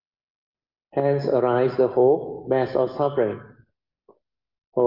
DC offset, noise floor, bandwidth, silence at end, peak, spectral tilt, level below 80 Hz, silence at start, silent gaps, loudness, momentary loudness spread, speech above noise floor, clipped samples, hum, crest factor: under 0.1%; -61 dBFS; 5.8 kHz; 0 s; -8 dBFS; -9.5 dB/octave; -66 dBFS; 0.95 s; 4.67-4.72 s; -22 LUFS; 8 LU; 40 dB; under 0.1%; none; 16 dB